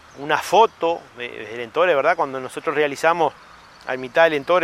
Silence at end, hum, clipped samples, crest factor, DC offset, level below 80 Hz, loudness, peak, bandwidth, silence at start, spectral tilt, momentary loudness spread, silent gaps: 0 s; none; under 0.1%; 18 dB; under 0.1%; -62 dBFS; -20 LUFS; -2 dBFS; 15.5 kHz; 0.15 s; -4 dB/octave; 14 LU; none